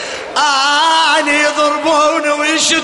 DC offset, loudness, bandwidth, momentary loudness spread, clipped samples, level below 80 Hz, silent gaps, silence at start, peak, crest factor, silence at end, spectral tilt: under 0.1%; -12 LUFS; 11.5 kHz; 4 LU; under 0.1%; -56 dBFS; none; 0 s; -2 dBFS; 10 dB; 0 s; 0 dB/octave